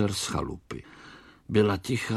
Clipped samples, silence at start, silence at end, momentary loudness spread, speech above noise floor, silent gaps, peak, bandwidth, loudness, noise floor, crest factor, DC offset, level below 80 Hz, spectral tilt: under 0.1%; 0 s; 0 s; 23 LU; 24 dB; none; -10 dBFS; 14.5 kHz; -28 LUFS; -51 dBFS; 20 dB; under 0.1%; -50 dBFS; -5 dB/octave